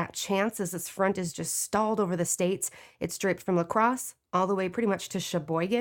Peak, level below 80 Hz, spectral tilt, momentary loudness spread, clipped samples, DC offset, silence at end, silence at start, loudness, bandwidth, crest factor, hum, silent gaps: -10 dBFS; -66 dBFS; -4.5 dB/octave; 6 LU; under 0.1%; under 0.1%; 0 s; 0 s; -29 LUFS; 18.5 kHz; 18 dB; none; none